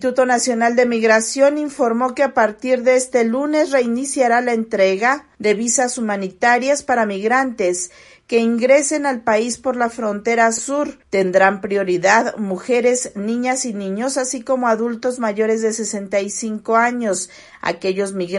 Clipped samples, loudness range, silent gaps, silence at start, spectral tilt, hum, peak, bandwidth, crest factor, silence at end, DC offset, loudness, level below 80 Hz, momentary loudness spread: under 0.1%; 3 LU; none; 0 s; -3.5 dB/octave; none; 0 dBFS; 11.5 kHz; 16 dB; 0 s; under 0.1%; -18 LUFS; -60 dBFS; 7 LU